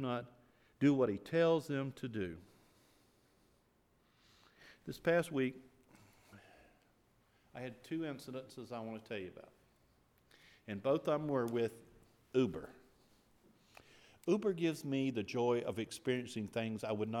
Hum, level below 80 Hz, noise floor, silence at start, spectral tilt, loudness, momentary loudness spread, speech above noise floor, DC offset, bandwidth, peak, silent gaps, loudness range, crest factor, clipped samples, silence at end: none; -76 dBFS; -74 dBFS; 0 s; -6.5 dB/octave; -38 LUFS; 16 LU; 37 dB; under 0.1%; 16 kHz; -20 dBFS; none; 10 LU; 20 dB; under 0.1%; 0 s